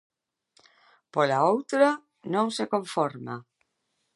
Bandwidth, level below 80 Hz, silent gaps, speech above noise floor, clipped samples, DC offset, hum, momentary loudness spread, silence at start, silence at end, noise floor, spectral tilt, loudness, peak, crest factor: 11.5 kHz; -82 dBFS; none; 52 dB; under 0.1%; under 0.1%; none; 14 LU; 1.15 s; 0.75 s; -77 dBFS; -5 dB/octave; -26 LUFS; -6 dBFS; 22 dB